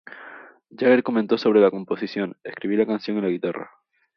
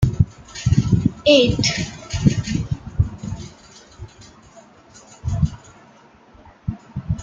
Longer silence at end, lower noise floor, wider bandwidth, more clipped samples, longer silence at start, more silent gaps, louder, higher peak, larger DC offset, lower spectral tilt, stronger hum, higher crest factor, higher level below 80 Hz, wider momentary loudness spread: first, 0.5 s vs 0 s; second, -44 dBFS vs -49 dBFS; second, 6.4 kHz vs 9 kHz; neither; about the same, 0.1 s vs 0 s; neither; about the same, -22 LUFS vs -20 LUFS; about the same, -4 dBFS vs -2 dBFS; neither; first, -8 dB/octave vs -5.5 dB/octave; neither; about the same, 18 dB vs 20 dB; second, -70 dBFS vs -34 dBFS; second, 20 LU vs 24 LU